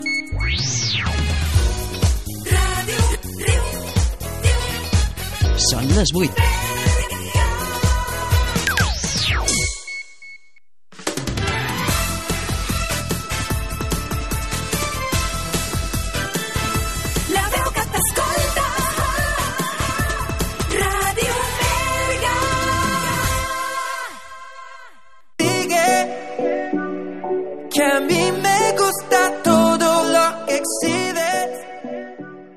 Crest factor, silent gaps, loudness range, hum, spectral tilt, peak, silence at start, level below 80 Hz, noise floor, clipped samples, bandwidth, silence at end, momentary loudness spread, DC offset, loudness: 18 dB; none; 5 LU; none; -4 dB/octave; -2 dBFS; 0 s; -28 dBFS; -59 dBFS; under 0.1%; 13.5 kHz; 0 s; 9 LU; 0.9%; -20 LUFS